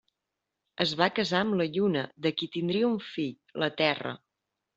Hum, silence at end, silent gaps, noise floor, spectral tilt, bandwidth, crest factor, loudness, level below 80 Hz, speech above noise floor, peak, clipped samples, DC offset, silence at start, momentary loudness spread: none; 0.6 s; none; -86 dBFS; -3.5 dB/octave; 8 kHz; 22 dB; -29 LUFS; -70 dBFS; 57 dB; -6 dBFS; under 0.1%; under 0.1%; 0.8 s; 9 LU